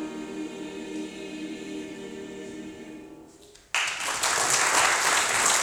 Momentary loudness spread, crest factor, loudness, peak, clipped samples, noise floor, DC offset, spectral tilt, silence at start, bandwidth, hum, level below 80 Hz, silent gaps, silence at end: 19 LU; 20 dB; -24 LUFS; -8 dBFS; under 0.1%; -52 dBFS; under 0.1%; -0.5 dB/octave; 0 s; over 20 kHz; none; -62 dBFS; none; 0 s